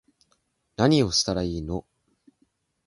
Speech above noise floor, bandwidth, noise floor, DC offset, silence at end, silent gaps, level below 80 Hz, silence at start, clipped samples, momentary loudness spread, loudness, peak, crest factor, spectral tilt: 47 dB; 11.5 kHz; -71 dBFS; under 0.1%; 1.05 s; none; -46 dBFS; 0.8 s; under 0.1%; 14 LU; -24 LUFS; -6 dBFS; 22 dB; -4.5 dB/octave